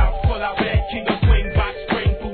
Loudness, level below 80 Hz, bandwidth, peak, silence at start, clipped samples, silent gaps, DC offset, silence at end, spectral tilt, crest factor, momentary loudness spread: -20 LUFS; -22 dBFS; 4.5 kHz; -4 dBFS; 0 s; under 0.1%; none; under 0.1%; 0 s; -10 dB/octave; 14 dB; 5 LU